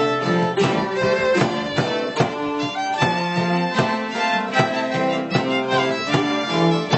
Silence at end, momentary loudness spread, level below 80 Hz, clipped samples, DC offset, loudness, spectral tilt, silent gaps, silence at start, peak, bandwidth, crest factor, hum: 0 s; 3 LU; -58 dBFS; under 0.1%; under 0.1%; -20 LUFS; -5.5 dB/octave; none; 0 s; -4 dBFS; 8.4 kHz; 16 dB; none